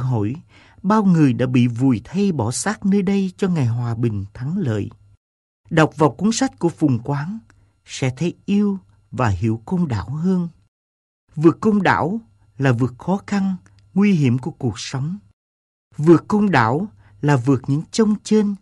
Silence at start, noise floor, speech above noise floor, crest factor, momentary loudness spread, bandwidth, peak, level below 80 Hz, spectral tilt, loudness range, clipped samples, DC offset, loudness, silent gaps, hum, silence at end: 0 s; under -90 dBFS; over 72 dB; 20 dB; 11 LU; 11.5 kHz; 0 dBFS; -52 dBFS; -6.5 dB/octave; 4 LU; under 0.1%; under 0.1%; -19 LUFS; 5.17-5.64 s, 10.68-11.27 s, 15.33-15.91 s; none; 0.05 s